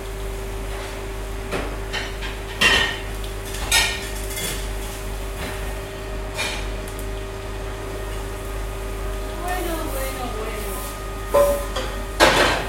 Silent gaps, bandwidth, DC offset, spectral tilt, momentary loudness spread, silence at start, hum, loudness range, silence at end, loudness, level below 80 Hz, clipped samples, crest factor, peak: none; 16.5 kHz; under 0.1%; -3 dB/octave; 14 LU; 0 s; none; 8 LU; 0 s; -24 LUFS; -30 dBFS; under 0.1%; 24 dB; 0 dBFS